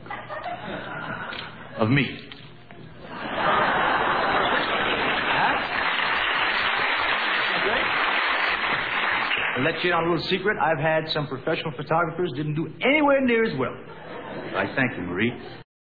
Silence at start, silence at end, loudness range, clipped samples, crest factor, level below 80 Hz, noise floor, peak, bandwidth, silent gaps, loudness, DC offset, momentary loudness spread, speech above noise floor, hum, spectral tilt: 0 s; 0.2 s; 3 LU; under 0.1%; 18 dB; -54 dBFS; -44 dBFS; -8 dBFS; 5 kHz; none; -23 LUFS; 0.3%; 13 LU; 21 dB; none; -7.5 dB/octave